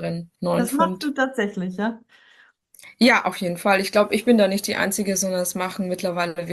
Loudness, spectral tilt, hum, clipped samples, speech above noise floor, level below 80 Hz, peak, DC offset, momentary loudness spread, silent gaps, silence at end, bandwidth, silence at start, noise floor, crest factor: -22 LUFS; -4 dB/octave; none; under 0.1%; 34 dB; -64 dBFS; -4 dBFS; under 0.1%; 9 LU; none; 0 s; 13 kHz; 0 s; -56 dBFS; 18 dB